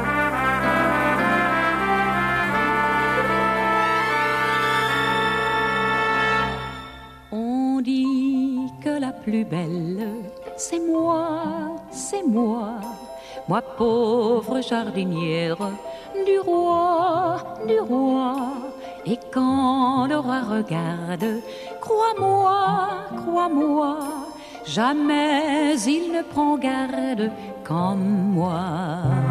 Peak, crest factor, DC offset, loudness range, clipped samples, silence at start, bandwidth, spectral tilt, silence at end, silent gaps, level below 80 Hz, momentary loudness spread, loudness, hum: -6 dBFS; 16 dB; under 0.1%; 5 LU; under 0.1%; 0 s; 14 kHz; -5.5 dB/octave; 0 s; none; -50 dBFS; 11 LU; -22 LUFS; none